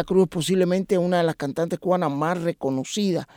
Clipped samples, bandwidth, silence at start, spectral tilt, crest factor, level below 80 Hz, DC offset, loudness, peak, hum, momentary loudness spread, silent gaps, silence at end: under 0.1%; 16.5 kHz; 0 s; -6 dB/octave; 16 dB; -56 dBFS; under 0.1%; -23 LUFS; -8 dBFS; none; 5 LU; none; 0.1 s